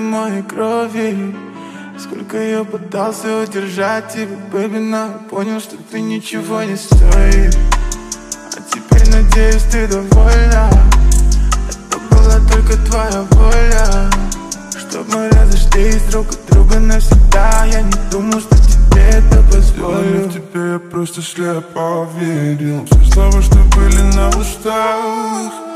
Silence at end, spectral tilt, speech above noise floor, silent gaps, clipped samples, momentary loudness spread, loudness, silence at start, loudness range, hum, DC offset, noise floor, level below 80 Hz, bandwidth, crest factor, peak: 0 s; -5.5 dB/octave; 20 dB; none; under 0.1%; 13 LU; -14 LUFS; 0 s; 8 LU; none; under 0.1%; -30 dBFS; -10 dBFS; 13.5 kHz; 10 dB; 0 dBFS